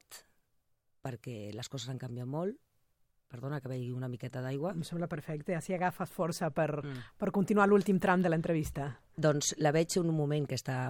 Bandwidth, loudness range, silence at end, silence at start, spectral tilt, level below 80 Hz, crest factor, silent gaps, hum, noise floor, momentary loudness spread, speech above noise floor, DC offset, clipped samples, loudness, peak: 17 kHz; 12 LU; 0 s; 0.1 s; -5.5 dB/octave; -62 dBFS; 20 dB; none; none; -76 dBFS; 15 LU; 43 dB; under 0.1%; under 0.1%; -33 LUFS; -14 dBFS